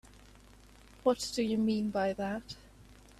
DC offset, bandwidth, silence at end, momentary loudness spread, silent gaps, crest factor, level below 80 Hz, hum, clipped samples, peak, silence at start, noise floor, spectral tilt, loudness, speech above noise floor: under 0.1%; 13 kHz; 0.25 s; 12 LU; none; 20 dB; -60 dBFS; 50 Hz at -55 dBFS; under 0.1%; -16 dBFS; 1.05 s; -57 dBFS; -5 dB/octave; -33 LUFS; 25 dB